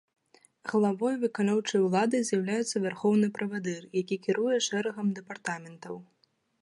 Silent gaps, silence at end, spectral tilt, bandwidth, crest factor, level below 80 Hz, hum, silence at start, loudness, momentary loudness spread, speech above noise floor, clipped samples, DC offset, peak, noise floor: none; 0.6 s; -5 dB/octave; 11.5 kHz; 16 dB; -78 dBFS; none; 0.65 s; -29 LUFS; 12 LU; 28 dB; under 0.1%; under 0.1%; -12 dBFS; -57 dBFS